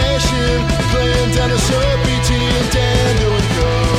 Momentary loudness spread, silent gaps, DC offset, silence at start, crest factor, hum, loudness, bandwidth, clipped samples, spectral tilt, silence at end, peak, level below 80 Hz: 1 LU; none; under 0.1%; 0 s; 12 dB; none; -15 LUFS; 15.5 kHz; under 0.1%; -5 dB/octave; 0 s; -2 dBFS; -20 dBFS